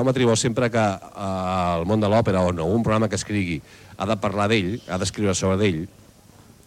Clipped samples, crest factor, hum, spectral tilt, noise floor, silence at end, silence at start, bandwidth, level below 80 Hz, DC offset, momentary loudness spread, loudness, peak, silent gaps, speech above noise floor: under 0.1%; 16 dB; none; -5.5 dB/octave; -50 dBFS; 0.8 s; 0 s; 14.5 kHz; -48 dBFS; under 0.1%; 9 LU; -22 LUFS; -8 dBFS; none; 28 dB